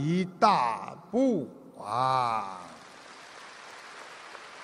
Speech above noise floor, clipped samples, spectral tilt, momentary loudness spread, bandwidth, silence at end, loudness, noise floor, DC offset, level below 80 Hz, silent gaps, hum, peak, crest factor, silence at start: 21 dB; under 0.1%; -6 dB/octave; 22 LU; 12 kHz; 0 s; -28 LUFS; -49 dBFS; under 0.1%; -72 dBFS; none; none; -8 dBFS; 24 dB; 0 s